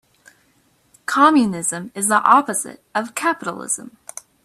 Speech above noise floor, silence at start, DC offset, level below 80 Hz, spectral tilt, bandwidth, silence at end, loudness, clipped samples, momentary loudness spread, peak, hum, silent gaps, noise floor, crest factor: 42 dB; 1.1 s; under 0.1%; -66 dBFS; -3 dB/octave; 14 kHz; 0.55 s; -18 LUFS; under 0.1%; 17 LU; 0 dBFS; none; none; -60 dBFS; 20 dB